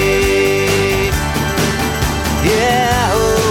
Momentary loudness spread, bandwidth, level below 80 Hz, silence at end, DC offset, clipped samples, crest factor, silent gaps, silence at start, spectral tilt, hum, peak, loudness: 4 LU; 19 kHz; -26 dBFS; 0 s; under 0.1%; under 0.1%; 12 dB; none; 0 s; -4.5 dB/octave; none; -2 dBFS; -14 LUFS